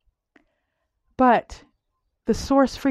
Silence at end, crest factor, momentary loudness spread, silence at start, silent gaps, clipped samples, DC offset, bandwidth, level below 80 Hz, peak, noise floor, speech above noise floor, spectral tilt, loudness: 0 s; 18 dB; 8 LU; 1.2 s; none; under 0.1%; under 0.1%; 13.5 kHz; -46 dBFS; -6 dBFS; -76 dBFS; 56 dB; -5.5 dB/octave; -21 LUFS